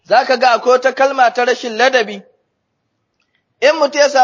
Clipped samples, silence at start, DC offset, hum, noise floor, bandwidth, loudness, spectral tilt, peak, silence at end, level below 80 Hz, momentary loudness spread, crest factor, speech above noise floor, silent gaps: under 0.1%; 0.1 s; under 0.1%; none; -69 dBFS; 7.6 kHz; -13 LUFS; -1.5 dB/octave; 0 dBFS; 0 s; -72 dBFS; 5 LU; 14 dB; 56 dB; none